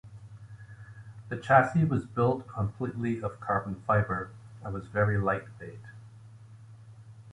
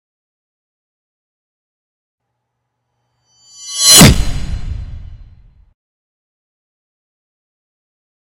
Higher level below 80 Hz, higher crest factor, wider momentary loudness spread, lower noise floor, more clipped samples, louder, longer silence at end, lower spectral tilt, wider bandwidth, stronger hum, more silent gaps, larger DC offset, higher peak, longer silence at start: second, -54 dBFS vs -28 dBFS; first, 24 dB vs 18 dB; about the same, 25 LU vs 25 LU; second, -50 dBFS vs -73 dBFS; second, under 0.1% vs 0.5%; second, -29 LUFS vs -6 LUFS; second, 0 s vs 3.1 s; first, -8.5 dB/octave vs -2.5 dB/octave; second, 10.5 kHz vs 16.5 kHz; neither; neither; neither; second, -6 dBFS vs 0 dBFS; second, 0.05 s vs 3.6 s